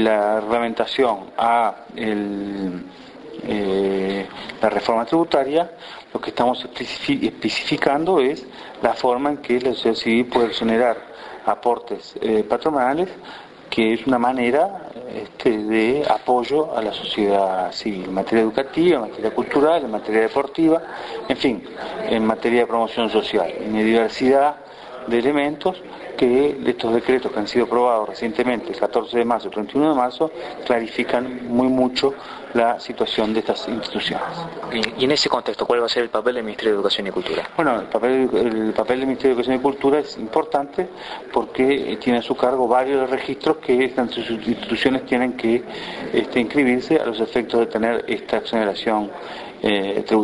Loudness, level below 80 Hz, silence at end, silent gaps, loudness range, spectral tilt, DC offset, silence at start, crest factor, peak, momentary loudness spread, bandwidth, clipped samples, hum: -20 LUFS; -54 dBFS; 0 s; none; 2 LU; -5.5 dB/octave; under 0.1%; 0 s; 20 dB; 0 dBFS; 9 LU; 11 kHz; under 0.1%; none